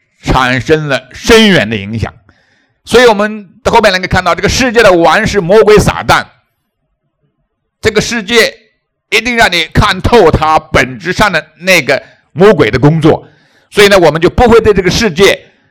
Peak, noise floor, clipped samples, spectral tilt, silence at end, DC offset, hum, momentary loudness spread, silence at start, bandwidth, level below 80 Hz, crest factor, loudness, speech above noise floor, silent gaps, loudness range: 0 dBFS; -64 dBFS; 6%; -4.5 dB/octave; 0.3 s; under 0.1%; none; 9 LU; 0.25 s; over 20 kHz; -28 dBFS; 8 dB; -8 LUFS; 57 dB; none; 4 LU